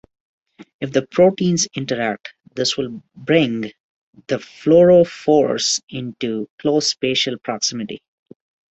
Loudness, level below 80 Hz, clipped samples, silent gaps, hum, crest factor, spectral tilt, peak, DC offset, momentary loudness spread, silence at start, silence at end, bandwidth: -18 LUFS; -58 dBFS; under 0.1%; 3.80-4.13 s, 5.83-5.87 s, 6.50-6.58 s; none; 18 dB; -4 dB/octave; -2 dBFS; under 0.1%; 16 LU; 0.8 s; 0.75 s; 8.2 kHz